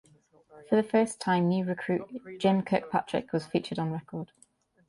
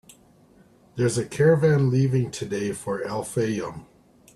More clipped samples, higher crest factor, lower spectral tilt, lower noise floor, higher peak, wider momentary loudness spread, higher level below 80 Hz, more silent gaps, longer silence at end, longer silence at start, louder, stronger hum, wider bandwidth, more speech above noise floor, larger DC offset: neither; about the same, 18 dB vs 18 dB; about the same, -6.5 dB/octave vs -6.5 dB/octave; first, -61 dBFS vs -55 dBFS; second, -12 dBFS vs -8 dBFS; about the same, 12 LU vs 12 LU; second, -68 dBFS vs -58 dBFS; neither; first, 0.65 s vs 0.5 s; second, 0.55 s vs 0.95 s; second, -29 LUFS vs -23 LUFS; neither; about the same, 11.5 kHz vs 12.5 kHz; about the same, 32 dB vs 33 dB; neither